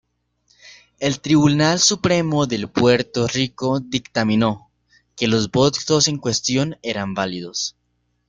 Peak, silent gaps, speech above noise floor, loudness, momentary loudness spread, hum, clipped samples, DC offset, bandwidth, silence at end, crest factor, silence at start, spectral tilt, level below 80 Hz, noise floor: -2 dBFS; none; 50 dB; -19 LUFS; 9 LU; 60 Hz at -45 dBFS; under 0.1%; under 0.1%; 9.6 kHz; 0.6 s; 18 dB; 0.65 s; -4 dB/octave; -52 dBFS; -69 dBFS